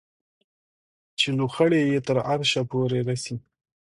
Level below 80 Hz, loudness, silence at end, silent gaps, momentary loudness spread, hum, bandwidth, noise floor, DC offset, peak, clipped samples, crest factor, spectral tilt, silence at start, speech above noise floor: -64 dBFS; -24 LUFS; 0.5 s; none; 12 LU; none; 11.5 kHz; under -90 dBFS; under 0.1%; -6 dBFS; under 0.1%; 18 dB; -5 dB/octave; 1.2 s; over 67 dB